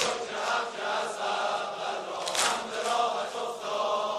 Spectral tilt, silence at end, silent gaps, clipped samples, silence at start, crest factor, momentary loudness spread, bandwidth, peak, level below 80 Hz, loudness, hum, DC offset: -0.5 dB/octave; 0 s; none; under 0.1%; 0 s; 22 dB; 6 LU; 14.5 kHz; -8 dBFS; -72 dBFS; -30 LUFS; none; under 0.1%